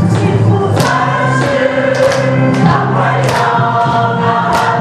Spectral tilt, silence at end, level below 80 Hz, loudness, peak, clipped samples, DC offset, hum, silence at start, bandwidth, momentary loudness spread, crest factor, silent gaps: -6.5 dB/octave; 0 s; -42 dBFS; -11 LUFS; 0 dBFS; under 0.1%; under 0.1%; none; 0 s; 13 kHz; 1 LU; 10 dB; none